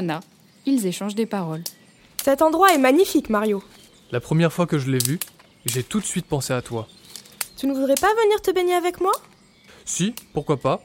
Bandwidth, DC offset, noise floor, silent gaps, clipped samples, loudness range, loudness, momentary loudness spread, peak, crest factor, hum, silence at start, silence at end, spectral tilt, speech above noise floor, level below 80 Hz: 17 kHz; under 0.1%; -51 dBFS; none; under 0.1%; 5 LU; -22 LUFS; 15 LU; -2 dBFS; 20 dB; none; 0 s; 0.05 s; -5 dB/octave; 30 dB; -54 dBFS